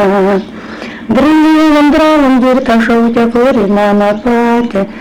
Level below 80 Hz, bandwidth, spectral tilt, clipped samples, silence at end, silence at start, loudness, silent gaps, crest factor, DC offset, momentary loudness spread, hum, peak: -36 dBFS; 14.5 kHz; -6.5 dB/octave; under 0.1%; 0 s; 0 s; -9 LUFS; none; 4 dB; under 0.1%; 9 LU; none; -4 dBFS